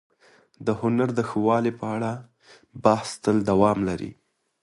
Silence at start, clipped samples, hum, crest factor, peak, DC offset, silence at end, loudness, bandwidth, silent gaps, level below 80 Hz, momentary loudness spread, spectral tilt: 0.6 s; under 0.1%; none; 22 dB; -2 dBFS; under 0.1%; 0.5 s; -24 LUFS; 11.5 kHz; none; -54 dBFS; 11 LU; -7 dB/octave